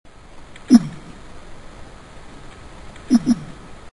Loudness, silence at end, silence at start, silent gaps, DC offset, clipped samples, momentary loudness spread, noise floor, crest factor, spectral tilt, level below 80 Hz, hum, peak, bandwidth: -17 LUFS; 0.2 s; 0.4 s; none; 0.3%; under 0.1%; 27 LU; -40 dBFS; 22 dB; -6 dB/octave; -44 dBFS; none; 0 dBFS; 11.5 kHz